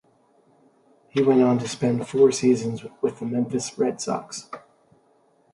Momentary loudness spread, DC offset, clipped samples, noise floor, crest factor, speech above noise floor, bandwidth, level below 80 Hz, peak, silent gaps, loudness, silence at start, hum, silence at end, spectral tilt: 14 LU; under 0.1%; under 0.1%; -62 dBFS; 18 dB; 40 dB; 11.5 kHz; -66 dBFS; -6 dBFS; none; -23 LUFS; 1.15 s; none; 0.95 s; -5.5 dB/octave